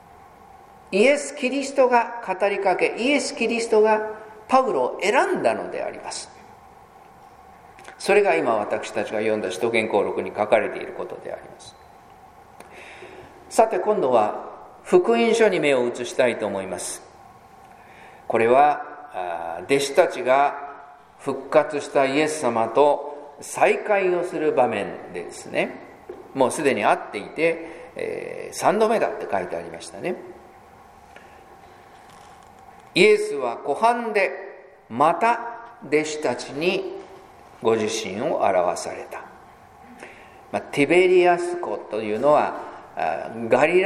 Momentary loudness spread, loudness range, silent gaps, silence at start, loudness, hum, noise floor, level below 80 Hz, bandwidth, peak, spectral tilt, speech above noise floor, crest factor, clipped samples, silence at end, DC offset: 17 LU; 5 LU; none; 0.9 s; -22 LUFS; none; -48 dBFS; -64 dBFS; 14 kHz; -2 dBFS; -4 dB/octave; 27 dB; 20 dB; under 0.1%; 0 s; under 0.1%